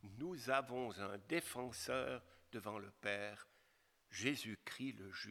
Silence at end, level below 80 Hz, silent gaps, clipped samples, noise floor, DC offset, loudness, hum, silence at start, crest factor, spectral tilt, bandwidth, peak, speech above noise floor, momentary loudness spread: 0 s; -78 dBFS; none; under 0.1%; -76 dBFS; under 0.1%; -44 LUFS; none; 0.05 s; 24 dB; -4 dB/octave; 19 kHz; -22 dBFS; 31 dB; 11 LU